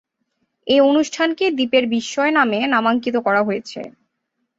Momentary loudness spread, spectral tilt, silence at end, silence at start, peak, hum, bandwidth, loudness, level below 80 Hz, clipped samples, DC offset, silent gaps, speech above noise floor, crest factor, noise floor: 14 LU; -4 dB/octave; 0.7 s; 0.65 s; -2 dBFS; none; 8 kHz; -18 LUFS; -64 dBFS; under 0.1%; under 0.1%; none; 57 dB; 16 dB; -74 dBFS